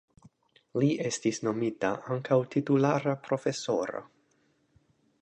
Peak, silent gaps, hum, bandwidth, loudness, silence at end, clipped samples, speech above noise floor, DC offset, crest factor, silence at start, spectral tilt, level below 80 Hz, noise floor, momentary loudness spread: -12 dBFS; none; none; 9.8 kHz; -29 LUFS; 1.15 s; under 0.1%; 41 dB; under 0.1%; 18 dB; 0.75 s; -6 dB/octave; -72 dBFS; -70 dBFS; 7 LU